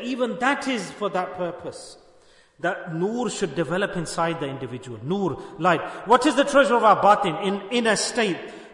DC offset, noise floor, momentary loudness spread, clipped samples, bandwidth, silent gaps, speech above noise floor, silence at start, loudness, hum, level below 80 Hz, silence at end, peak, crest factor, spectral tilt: under 0.1%; -55 dBFS; 14 LU; under 0.1%; 11 kHz; none; 32 dB; 0 s; -23 LUFS; none; -58 dBFS; 0 s; -4 dBFS; 20 dB; -4.5 dB/octave